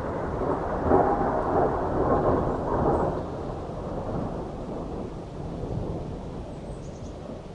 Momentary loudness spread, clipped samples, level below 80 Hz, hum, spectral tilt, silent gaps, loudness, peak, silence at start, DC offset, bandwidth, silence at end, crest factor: 14 LU; under 0.1%; -40 dBFS; none; -8.5 dB/octave; none; -28 LUFS; -8 dBFS; 0 s; under 0.1%; 10.5 kHz; 0 s; 20 dB